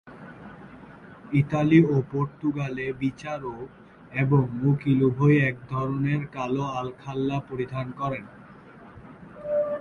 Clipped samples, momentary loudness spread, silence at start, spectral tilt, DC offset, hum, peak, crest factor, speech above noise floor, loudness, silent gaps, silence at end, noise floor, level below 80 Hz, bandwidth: under 0.1%; 25 LU; 0.05 s; -9 dB/octave; under 0.1%; none; -6 dBFS; 20 dB; 23 dB; -25 LUFS; none; 0 s; -47 dBFS; -56 dBFS; 6.8 kHz